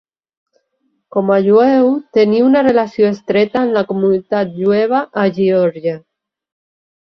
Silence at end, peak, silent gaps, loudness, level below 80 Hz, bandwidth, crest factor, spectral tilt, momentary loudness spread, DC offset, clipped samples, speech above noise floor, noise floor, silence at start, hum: 1.15 s; -2 dBFS; none; -14 LUFS; -58 dBFS; 6.4 kHz; 14 dB; -8 dB/octave; 8 LU; under 0.1%; under 0.1%; 53 dB; -66 dBFS; 1.15 s; none